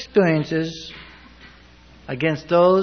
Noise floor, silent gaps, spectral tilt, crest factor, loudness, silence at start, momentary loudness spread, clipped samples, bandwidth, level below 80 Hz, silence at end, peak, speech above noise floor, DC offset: -48 dBFS; none; -7 dB/octave; 16 dB; -20 LUFS; 0 s; 21 LU; under 0.1%; 6.6 kHz; -52 dBFS; 0 s; -4 dBFS; 29 dB; under 0.1%